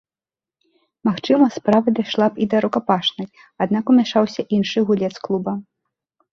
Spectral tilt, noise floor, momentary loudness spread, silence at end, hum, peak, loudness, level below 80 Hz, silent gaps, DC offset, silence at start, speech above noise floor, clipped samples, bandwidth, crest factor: -6.5 dB/octave; under -90 dBFS; 9 LU; 0.7 s; none; -2 dBFS; -19 LUFS; -62 dBFS; none; under 0.1%; 1.05 s; over 72 dB; under 0.1%; 7 kHz; 18 dB